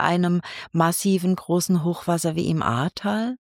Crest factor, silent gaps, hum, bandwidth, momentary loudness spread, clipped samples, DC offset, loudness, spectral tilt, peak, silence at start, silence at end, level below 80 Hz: 18 dB; none; none; 17 kHz; 5 LU; under 0.1%; under 0.1%; -23 LUFS; -5.5 dB/octave; -4 dBFS; 0 s; 0.1 s; -58 dBFS